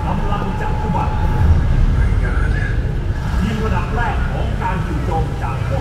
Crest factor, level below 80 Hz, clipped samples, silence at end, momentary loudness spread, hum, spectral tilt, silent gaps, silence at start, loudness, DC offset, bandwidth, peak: 14 dB; -20 dBFS; under 0.1%; 0 s; 5 LU; none; -7.5 dB/octave; none; 0 s; -19 LUFS; under 0.1%; 11 kHz; -2 dBFS